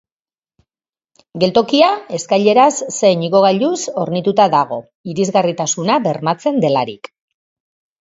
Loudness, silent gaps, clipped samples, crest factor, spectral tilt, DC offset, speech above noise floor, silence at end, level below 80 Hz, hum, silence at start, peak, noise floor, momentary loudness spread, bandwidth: -15 LUFS; 4.95-5.04 s; under 0.1%; 16 dB; -4.5 dB/octave; under 0.1%; over 75 dB; 1.05 s; -60 dBFS; none; 1.35 s; 0 dBFS; under -90 dBFS; 10 LU; 7.8 kHz